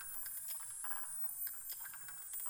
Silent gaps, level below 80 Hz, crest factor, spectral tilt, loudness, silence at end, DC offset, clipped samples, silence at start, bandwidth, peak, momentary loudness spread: none; -74 dBFS; 16 dB; 2 dB/octave; -41 LUFS; 0 s; under 0.1%; under 0.1%; 0 s; over 20 kHz; -30 dBFS; 6 LU